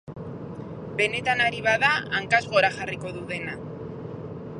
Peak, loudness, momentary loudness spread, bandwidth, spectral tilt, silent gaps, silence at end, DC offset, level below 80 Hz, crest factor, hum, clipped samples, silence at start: -6 dBFS; -24 LUFS; 16 LU; 11 kHz; -4.5 dB/octave; none; 0 s; under 0.1%; -56 dBFS; 22 dB; none; under 0.1%; 0.05 s